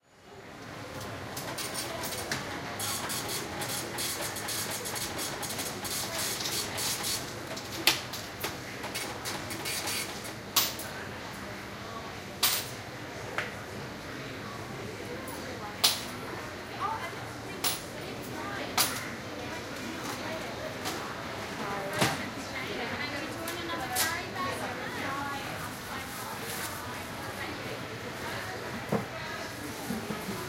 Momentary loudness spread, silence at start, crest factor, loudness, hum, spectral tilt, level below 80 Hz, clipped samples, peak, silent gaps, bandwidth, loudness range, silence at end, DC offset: 12 LU; 0.1 s; 30 dB; -33 LUFS; none; -2.5 dB/octave; -58 dBFS; under 0.1%; -4 dBFS; none; 17 kHz; 5 LU; 0 s; under 0.1%